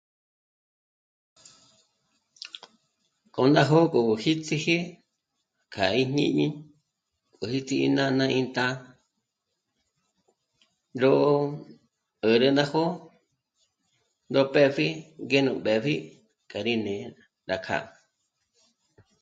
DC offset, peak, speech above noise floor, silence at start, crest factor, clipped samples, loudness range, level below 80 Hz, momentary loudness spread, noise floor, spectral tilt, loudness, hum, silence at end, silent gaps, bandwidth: under 0.1%; -6 dBFS; 57 dB; 2.45 s; 22 dB; under 0.1%; 4 LU; -66 dBFS; 20 LU; -81 dBFS; -6 dB/octave; -25 LUFS; none; 1.35 s; none; 9 kHz